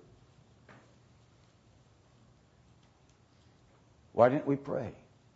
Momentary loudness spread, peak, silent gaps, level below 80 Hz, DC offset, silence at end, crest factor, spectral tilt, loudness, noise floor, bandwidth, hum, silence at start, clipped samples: 14 LU; -10 dBFS; none; -70 dBFS; under 0.1%; 0.4 s; 26 dB; -7 dB/octave; -30 LUFS; -64 dBFS; 7.6 kHz; none; 4.15 s; under 0.1%